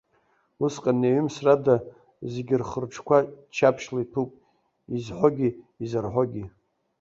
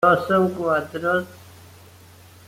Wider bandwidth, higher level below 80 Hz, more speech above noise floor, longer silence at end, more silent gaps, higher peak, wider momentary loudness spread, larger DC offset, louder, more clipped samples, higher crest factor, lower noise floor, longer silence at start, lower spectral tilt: second, 7.8 kHz vs 16.5 kHz; about the same, -60 dBFS vs -62 dBFS; first, 43 dB vs 27 dB; second, 0.5 s vs 1 s; neither; about the same, -4 dBFS vs -4 dBFS; first, 13 LU vs 7 LU; neither; second, -25 LUFS vs -21 LUFS; neither; about the same, 22 dB vs 18 dB; first, -67 dBFS vs -47 dBFS; first, 0.6 s vs 0 s; about the same, -7 dB/octave vs -6.5 dB/octave